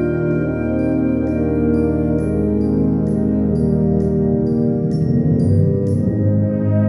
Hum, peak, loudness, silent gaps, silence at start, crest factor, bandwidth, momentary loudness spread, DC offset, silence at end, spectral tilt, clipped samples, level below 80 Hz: none; -4 dBFS; -17 LUFS; none; 0 s; 12 dB; 11.5 kHz; 2 LU; under 0.1%; 0 s; -11 dB/octave; under 0.1%; -32 dBFS